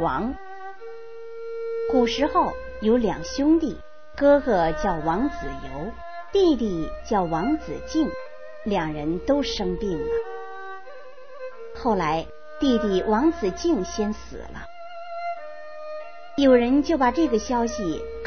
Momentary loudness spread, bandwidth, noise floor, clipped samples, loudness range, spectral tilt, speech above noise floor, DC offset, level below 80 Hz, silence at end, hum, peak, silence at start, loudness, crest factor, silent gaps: 19 LU; 6.6 kHz; -44 dBFS; under 0.1%; 5 LU; -5.5 dB/octave; 21 dB; 1%; -44 dBFS; 0 s; none; -6 dBFS; 0 s; -24 LUFS; 18 dB; none